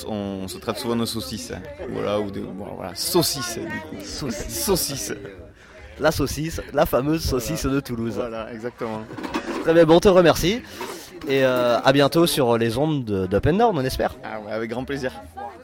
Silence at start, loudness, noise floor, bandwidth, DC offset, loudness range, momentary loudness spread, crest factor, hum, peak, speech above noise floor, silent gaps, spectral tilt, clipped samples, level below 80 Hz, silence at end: 0 s; -22 LUFS; -44 dBFS; 17 kHz; under 0.1%; 7 LU; 15 LU; 18 dB; none; -4 dBFS; 22 dB; none; -5 dB/octave; under 0.1%; -42 dBFS; 0 s